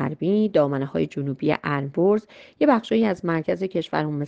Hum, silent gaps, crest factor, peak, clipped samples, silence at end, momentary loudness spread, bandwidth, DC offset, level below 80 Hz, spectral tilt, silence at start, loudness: none; none; 18 dB; -6 dBFS; under 0.1%; 0 s; 6 LU; 7.8 kHz; under 0.1%; -60 dBFS; -8.5 dB/octave; 0 s; -23 LUFS